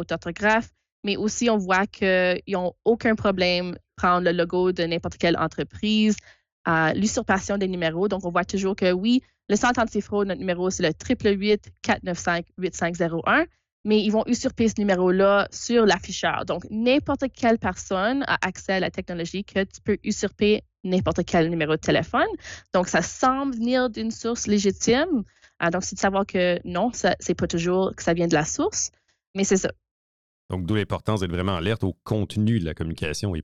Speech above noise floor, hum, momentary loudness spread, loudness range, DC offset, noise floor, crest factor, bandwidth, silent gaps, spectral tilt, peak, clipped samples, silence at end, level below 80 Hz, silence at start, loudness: over 67 dB; none; 7 LU; 3 LU; under 0.1%; under -90 dBFS; 14 dB; 11 kHz; 0.92-1.03 s, 6.52-6.64 s, 13.72-13.84 s, 29.27-29.34 s, 29.91-30.49 s; -4.5 dB/octave; -10 dBFS; under 0.1%; 0 s; -50 dBFS; 0 s; -23 LUFS